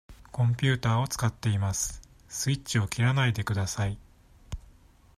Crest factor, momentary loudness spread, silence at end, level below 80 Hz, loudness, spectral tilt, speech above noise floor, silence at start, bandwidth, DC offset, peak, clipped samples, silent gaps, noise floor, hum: 18 dB; 19 LU; 0.6 s; -50 dBFS; -28 LUFS; -4.5 dB/octave; 29 dB; 0.1 s; 15 kHz; under 0.1%; -10 dBFS; under 0.1%; none; -56 dBFS; none